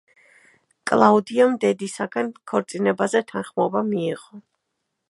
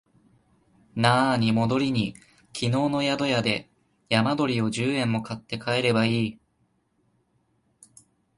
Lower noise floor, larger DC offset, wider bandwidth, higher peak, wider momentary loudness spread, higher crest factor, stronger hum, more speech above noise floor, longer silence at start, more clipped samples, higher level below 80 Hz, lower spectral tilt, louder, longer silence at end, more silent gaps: first, -78 dBFS vs -69 dBFS; neither; about the same, 11.5 kHz vs 11.5 kHz; first, 0 dBFS vs -4 dBFS; about the same, 11 LU vs 10 LU; about the same, 22 dB vs 22 dB; neither; first, 57 dB vs 46 dB; about the same, 0.85 s vs 0.95 s; neither; second, -70 dBFS vs -60 dBFS; about the same, -5.5 dB/octave vs -5.5 dB/octave; first, -21 LUFS vs -24 LUFS; second, 0.7 s vs 2.05 s; neither